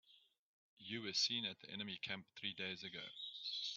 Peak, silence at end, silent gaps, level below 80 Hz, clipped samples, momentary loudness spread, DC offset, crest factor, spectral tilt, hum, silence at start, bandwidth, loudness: -26 dBFS; 0 s; 0.38-0.77 s; -88 dBFS; under 0.1%; 11 LU; under 0.1%; 22 dB; -1 dB/octave; none; 0.1 s; 7.6 kHz; -43 LUFS